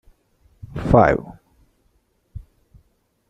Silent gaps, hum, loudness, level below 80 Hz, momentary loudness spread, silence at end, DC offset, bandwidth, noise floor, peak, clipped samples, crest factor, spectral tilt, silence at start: none; none; -18 LUFS; -40 dBFS; 27 LU; 0.9 s; under 0.1%; 9.8 kHz; -64 dBFS; -2 dBFS; under 0.1%; 22 dB; -9 dB/octave; 0.75 s